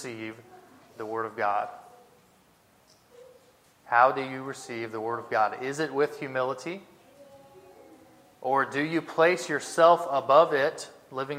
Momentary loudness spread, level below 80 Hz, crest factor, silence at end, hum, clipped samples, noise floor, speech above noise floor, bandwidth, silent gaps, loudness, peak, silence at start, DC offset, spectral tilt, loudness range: 17 LU; -78 dBFS; 22 dB; 0 s; none; under 0.1%; -62 dBFS; 35 dB; 15.5 kHz; none; -26 LUFS; -6 dBFS; 0 s; under 0.1%; -4.5 dB/octave; 11 LU